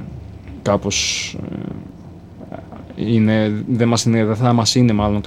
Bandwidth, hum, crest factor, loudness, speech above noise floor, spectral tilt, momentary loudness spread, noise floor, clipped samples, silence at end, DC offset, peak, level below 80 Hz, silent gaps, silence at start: 13.5 kHz; none; 16 dB; -17 LUFS; 21 dB; -5 dB/octave; 21 LU; -37 dBFS; under 0.1%; 0 s; under 0.1%; -2 dBFS; -40 dBFS; none; 0 s